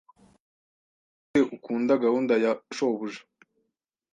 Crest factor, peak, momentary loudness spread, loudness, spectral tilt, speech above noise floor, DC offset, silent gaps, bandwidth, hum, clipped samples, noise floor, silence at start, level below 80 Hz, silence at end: 18 dB; -10 dBFS; 9 LU; -26 LUFS; -5.5 dB/octave; 56 dB; under 0.1%; none; 9.4 kHz; none; under 0.1%; -81 dBFS; 1.35 s; -72 dBFS; 0.95 s